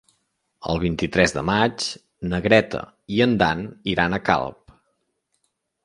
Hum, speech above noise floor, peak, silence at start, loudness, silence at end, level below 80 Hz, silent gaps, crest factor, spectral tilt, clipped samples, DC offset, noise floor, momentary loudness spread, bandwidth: none; 52 dB; 0 dBFS; 0.6 s; -22 LUFS; 1.3 s; -44 dBFS; none; 22 dB; -5 dB/octave; under 0.1%; under 0.1%; -73 dBFS; 12 LU; 11.5 kHz